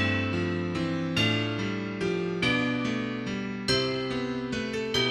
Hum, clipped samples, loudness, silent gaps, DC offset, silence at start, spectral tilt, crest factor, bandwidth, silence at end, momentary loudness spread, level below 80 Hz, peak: none; under 0.1%; -28 LUFS; none; under 0.1%; 0 s; -5 dB/octave; 16 dB; 13.5 kHz; 0 s; 6 LU; -54 dBFS; -12 dBFS